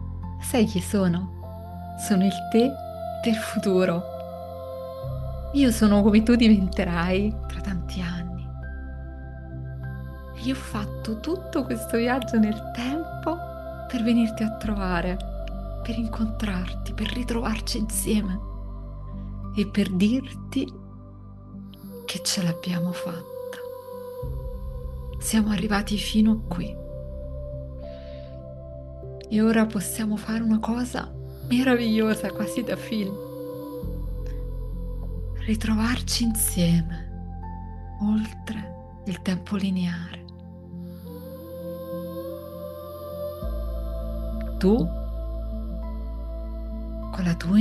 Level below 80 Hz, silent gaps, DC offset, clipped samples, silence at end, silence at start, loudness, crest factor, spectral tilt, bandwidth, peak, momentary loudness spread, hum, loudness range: -36 dBFS; none; under 0.1%; under 0.1%; 0 s; 0 s; -26 LUFS; 20 dB; -5.5 dB/octave; 13 kHz; -6 dBFS; 16 LU; none; 9 LU